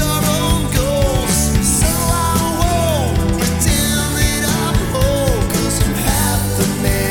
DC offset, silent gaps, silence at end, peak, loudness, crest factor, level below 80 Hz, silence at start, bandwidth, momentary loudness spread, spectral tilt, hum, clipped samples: under 0.1%; none; 0 s; -2 dBFS; -16 LUFS; 14 dB; -22 dBFS; 0 s; 19 kHz; 3 LU; -4.5 dB/octave; none; under 0.1%